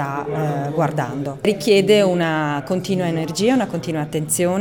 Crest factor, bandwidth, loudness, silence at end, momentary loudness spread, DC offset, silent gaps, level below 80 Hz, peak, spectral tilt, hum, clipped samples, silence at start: 16 dB; 18 kHz; -19 LUFS; 0 s; 9 LU; 0.2%; none; -56 dBFS; -4 dBFS; -5 dB/octave; none; under 0.1%; 0 s